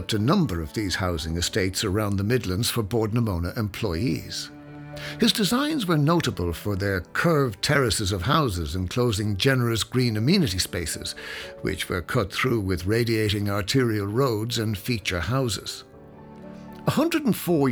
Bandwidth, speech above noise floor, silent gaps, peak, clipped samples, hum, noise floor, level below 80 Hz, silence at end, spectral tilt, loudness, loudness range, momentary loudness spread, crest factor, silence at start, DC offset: over 20 kHz; 21 dB; none; -4 dBFS; under 0.1%; none; -45 dBFS; -44 dBFS; 0 s; -5 dB/octave; -24 LUFS; 3 LU; 9 LU; 20 dB; 0 s; under 0.1%